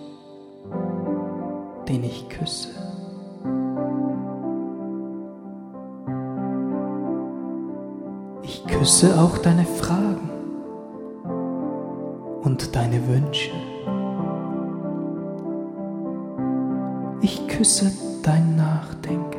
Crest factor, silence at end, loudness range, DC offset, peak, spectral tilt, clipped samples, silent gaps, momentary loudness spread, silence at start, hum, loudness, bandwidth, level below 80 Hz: 20 dB; 0 s; 9 LU; under 0.1%; -4 dBFS; -5 dB/octave; under 0.1%; none; 16 LU; 0 s; none; -24 LUFS; 16 kHz; -48 dBFS